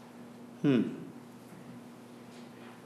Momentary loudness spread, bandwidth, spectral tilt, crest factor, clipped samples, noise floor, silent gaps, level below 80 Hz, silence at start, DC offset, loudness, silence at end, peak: 21 LU; 13 kHz; -7.5 dB/octave; 20 dB; under 0.1%; -50 dBFS; none; -84 dBFS; 0 s; under 0.1%; -31 LUFS; 0 s; -16 dBFS